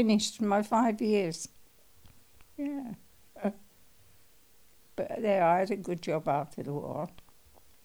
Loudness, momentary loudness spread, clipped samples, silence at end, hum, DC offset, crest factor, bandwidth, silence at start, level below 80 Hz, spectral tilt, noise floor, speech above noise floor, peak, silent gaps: -31 LUFS; 16 LU; under 0.1%; 0.75 s; none; 0.1%; 18 dB; over 20 kHz; 0 s; -68 dBFS; -5 dB/octave; -63 dBFS; 34 dB; -14 dBFS; none